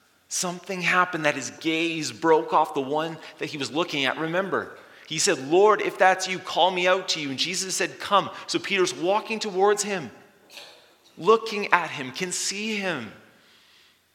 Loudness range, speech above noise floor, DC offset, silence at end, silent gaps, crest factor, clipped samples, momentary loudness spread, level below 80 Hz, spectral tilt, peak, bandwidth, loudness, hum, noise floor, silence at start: 4 LU; 34 dB; under 0.1%; 0.95 s; none; 24 dB; under 0.1%; 11 LU; -80 dBFS; -2.5 dB/octave; 0 dBFS; 17.5 kHz; -24 LUFS; none; -58 dBFS; 0.3 s